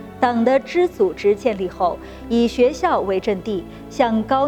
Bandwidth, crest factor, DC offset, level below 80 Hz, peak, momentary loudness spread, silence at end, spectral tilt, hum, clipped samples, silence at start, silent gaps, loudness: 14 kHz; 18 dB; under 0.1%; -44 dBFS; -2 dBFS; 8 LU; 0 s; -6 dB/octave; none; under 0.1%; 0 s; none; -19 LUFS